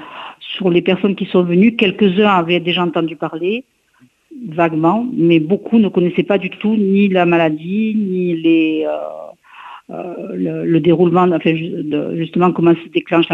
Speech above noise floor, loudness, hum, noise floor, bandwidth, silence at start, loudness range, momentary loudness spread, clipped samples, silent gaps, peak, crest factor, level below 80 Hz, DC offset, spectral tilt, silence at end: 39 dB; -15 LUFS; none; -54 dBFS; 4.1 kHz; 0 s; 3 LU; 14 LU; under 0.1%; none; 0 dBFS; 14 dB; -58 dBFS; under 0.1%; -9 dB/octave; 0 s